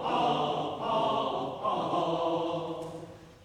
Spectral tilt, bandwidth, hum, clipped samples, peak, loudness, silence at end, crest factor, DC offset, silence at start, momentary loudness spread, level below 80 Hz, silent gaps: -6 dB/octave; 11.5 kHz; none; under 0.1%; -16 dBFS; -31 LUFS; 0 s; 14 dB; under 0.1%; 0 s; 11 LU; -64 dBFS; none